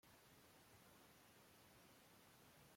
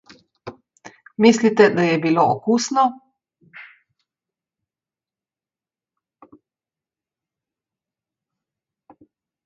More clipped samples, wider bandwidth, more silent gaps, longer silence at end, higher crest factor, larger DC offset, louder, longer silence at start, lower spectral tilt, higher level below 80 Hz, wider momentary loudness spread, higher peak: neither; first, 16.5 kHz vs 7.8 kHz; neither; second, 0 s vs 5.85 s; second, 14 dB vs 24 dB; neither; second, -68 LUFS vs -17 LUFS; second, 0.05 s vs 0.45 s; second, -3 dB/octave vs -5 dB/octave; second, -88 dBFS vs -68 dBFS; second, 0 LU vs 25 LU; second, -56 dBFS vs 0 dBFS